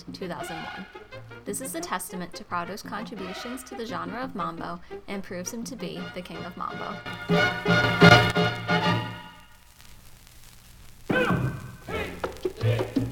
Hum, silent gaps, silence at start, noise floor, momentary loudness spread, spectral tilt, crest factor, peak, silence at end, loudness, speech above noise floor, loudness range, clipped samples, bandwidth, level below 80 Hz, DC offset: none; none; 0 s; -50 dBFS; 15 LU; -5 dB/octave; 26 dB; 0 dBFS; 0 s; -26 LUFS; 24 dB; 12 LU; under 0.1%; 18 kHz; -50 dBFS; under 0.1%